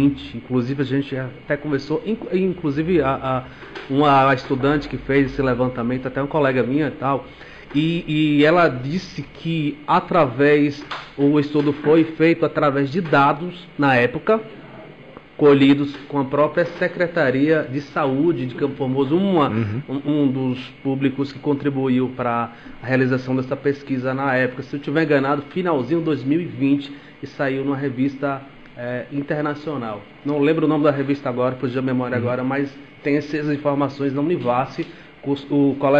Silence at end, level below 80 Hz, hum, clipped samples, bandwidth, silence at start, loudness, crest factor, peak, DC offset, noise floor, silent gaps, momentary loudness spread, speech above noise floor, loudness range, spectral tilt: 0 s; -50 dBFS; none; under 0.1%; 7.4 kHz; 0 s; -20 LUFS; 14 dB; -6 dBFS; 0.2%; -42 dBFS; none; 11 LU; 22 dB; 4 LU; -8 dB/octave